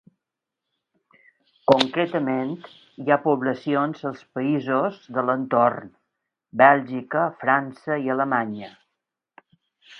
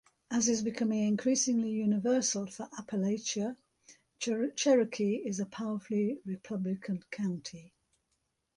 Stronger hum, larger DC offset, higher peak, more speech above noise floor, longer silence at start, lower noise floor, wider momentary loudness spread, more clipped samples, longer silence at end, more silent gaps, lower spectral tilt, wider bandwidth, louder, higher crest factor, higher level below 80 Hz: neither; neither; first, 0 dBFS vs -14 dBFS; first, 63 dB vs 49 dB; first, 1.7 s vs 0.3 s; first, -85 dBFS vs -80 dBFS; first, 14 LU vs 11 LU; neither; second, 0 s vs 0.9 s; neither; first, -6.5 dB/octave vs -4.5 dB/octave; second, 9.6 kHz vs 11 kHz; first, -22 LUFS vs -32 LUFS; first, 24 dB vs 18 dB; about the same, -70 dBFS vs -74 dBFS